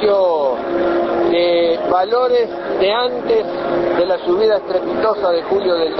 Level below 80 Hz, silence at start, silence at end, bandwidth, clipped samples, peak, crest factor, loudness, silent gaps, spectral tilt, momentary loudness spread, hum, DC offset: -50 dBFS; 0 s; 0 s; 6 kHz; under 0.1%; -2 dBFS; 14 dB; -16 LUFS; none; -7 dB/octave; 4 LU; none; under 0.1%